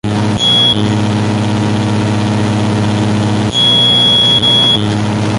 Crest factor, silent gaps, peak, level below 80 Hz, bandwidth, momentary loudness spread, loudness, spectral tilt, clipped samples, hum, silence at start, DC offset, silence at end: 10 dB; none; 0 dBFS; -36 dBFS; 11.5 kHz; 8 LU; -10 LUFS; -5 dB/octave; under 0.1%; 60 Hz at -20 dBFS; 0.05 s; under 0.1%; 0 s